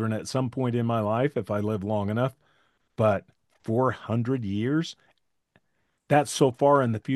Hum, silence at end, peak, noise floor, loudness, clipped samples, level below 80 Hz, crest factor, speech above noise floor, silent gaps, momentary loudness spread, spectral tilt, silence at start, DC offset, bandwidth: none; 0 s; -8 dBFS; -75 dBFS; -26 LUFS; under 0.1%; -68 dBFS; 20 dB; 50 dB; none; 8 LU; -6.5 dB/octave; 0 s; under 0.1%; 12.5 kHz